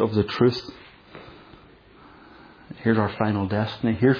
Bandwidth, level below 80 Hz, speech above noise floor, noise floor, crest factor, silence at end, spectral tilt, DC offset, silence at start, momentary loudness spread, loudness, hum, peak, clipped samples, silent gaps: 5.4 kHz; -54 dBFS; 29 dB; -50 dBFS; 18 dB; 0 s; -8.5 dB/octave; under 0.1%; 0 s; 23 LU; -24 LUFS; none; -6 dBFS; under 0.1%; none